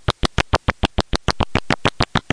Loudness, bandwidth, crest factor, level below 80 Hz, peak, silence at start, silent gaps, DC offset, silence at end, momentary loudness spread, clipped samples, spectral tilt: -21 LUFS; 10.5 kHz; 20 dB; -28 dBFS; -2 dBFS; 0.1 s; none; under 0.1%; 0 s; 3 LU; under 0.1%; -4.5 dB/octave